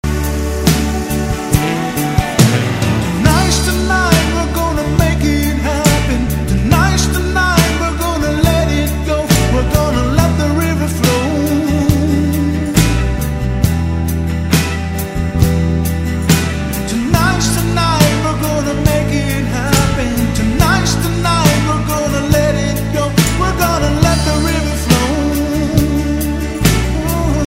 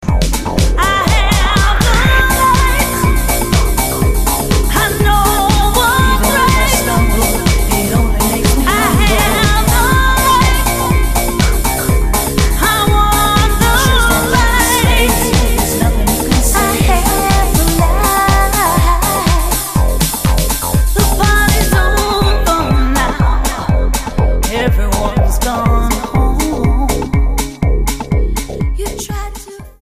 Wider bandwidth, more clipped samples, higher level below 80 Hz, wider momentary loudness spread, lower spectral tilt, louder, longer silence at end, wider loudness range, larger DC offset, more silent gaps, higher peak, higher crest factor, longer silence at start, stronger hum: about the same, 16.5 kHz vs 15.5 kHz; neither; second, -20 dBFS vs -14 dBFS; about the same, 5 LU vs 5 LU; about the same, -5 dB/octave vs -4 dB/octave; about the same, -14 LUFS vs -12 LUFS; about the same, 0.05 s vs 0.1 s; about the same, 2 LU vs 3 LU; second, under 0.1% vs 0.5%; neither; about the same, 0 dBFS vs 0 dBFS; about the same, 14 dB vs 12 dB; about the same, 0.05 s vs 0 s; neither